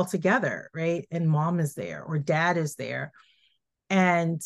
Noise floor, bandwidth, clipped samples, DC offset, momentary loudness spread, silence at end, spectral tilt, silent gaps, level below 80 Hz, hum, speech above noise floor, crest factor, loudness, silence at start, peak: -70 dBFS; 12.5 kHz; under 0.1%; under 0.1%; 10 LU; 0 s; -6.5 dB/octave; none; -72 dBFS; none; 44 dB; 18 dB; -26 LUFS; 0 s; -8 dBFS